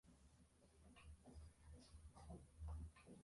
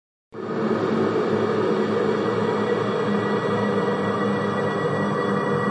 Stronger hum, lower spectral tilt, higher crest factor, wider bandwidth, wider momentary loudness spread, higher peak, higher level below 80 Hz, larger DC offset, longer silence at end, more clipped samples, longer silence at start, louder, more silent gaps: neither; about the same, -6 dB/octave vs -7 dB/octave; about the same, 16 dB vs 12 dB; first, 11.5 kHz vs 9.4 kHz; first, 10 LU vs 2 LU; second, -44 dBFS vs -10 dBFS; about the same, -62 dBFS vs -66 dBFS; neither; about the same, 0 s vs 0 s; neither; second, 0.05 s vs 0.35 s; second, -61 LUFS vs -23 LUFS; neither